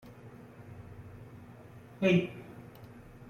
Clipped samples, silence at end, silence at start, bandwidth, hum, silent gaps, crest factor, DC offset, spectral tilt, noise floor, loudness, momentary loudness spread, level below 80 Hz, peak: under 0.1%; 0.45 s; 0.25 s; 14.5 kHz; none; none; 22 dB; under 0.1%; -7.5 dB/octave; -52 dBFS; -30 LUFS; 24 LU; -64 dBFS; -14 dBFS